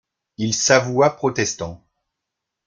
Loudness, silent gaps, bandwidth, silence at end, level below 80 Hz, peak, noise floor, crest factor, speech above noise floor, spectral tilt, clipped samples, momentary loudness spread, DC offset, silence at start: -18 LUFS; none; 10.5 kHz; 0.9 s; -56 dBFS; 0 dBFS; -82 dBFS; 22 dB; 63 dB; -3.5 dB/octave; under 0.1%; 13 LU; under 0.1%; 0.4 s